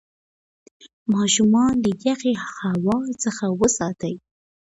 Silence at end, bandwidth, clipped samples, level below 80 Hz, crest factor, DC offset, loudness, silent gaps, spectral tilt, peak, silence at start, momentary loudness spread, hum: 0.6 s; 8.4 kHz; under 0.1%; -52 dBFS; 16 dB; under 0.1%; -21 LUFS; 0.93-1.06 s; -4.5 dB/octave; -6 dBFS; 0.85 s; 12 LU; none